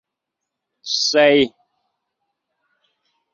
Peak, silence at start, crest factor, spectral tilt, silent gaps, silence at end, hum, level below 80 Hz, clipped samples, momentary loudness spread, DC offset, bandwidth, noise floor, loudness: -2 dBFS; 0.85 s; 20 dB; -2.5 dB/octave; none; 1.85 s; none; -62 dBFS; under 0.1%; 11 LU; under 0.1%; 7.4 kHz; -82 dBFS; -16 LUFS